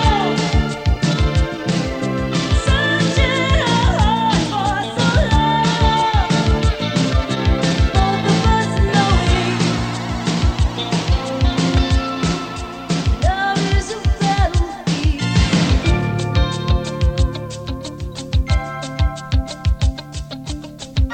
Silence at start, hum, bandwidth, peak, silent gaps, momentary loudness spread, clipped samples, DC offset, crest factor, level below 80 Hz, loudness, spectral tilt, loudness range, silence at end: 0 s; none; 9.4 kHz; -2 dBFS; none; 7 LU; under 0.1%; under 0.1%; 16 dB; -22 dBFS; -18 LUFS; -5.5 dB/octave; 5 LU; 0 s